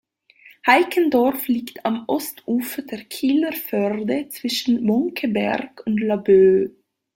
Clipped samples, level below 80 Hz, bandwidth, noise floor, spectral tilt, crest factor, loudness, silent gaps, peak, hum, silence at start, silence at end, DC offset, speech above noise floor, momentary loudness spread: under 0.1%; -62 dBFS; 17 kHz; -51 dBFS; -5 dB/octave; 18 dB; -20 LUFS; none; -2 dBFS; none; 0.65 s; 0.45 s; under 0.1%; 32 dB; 9 LU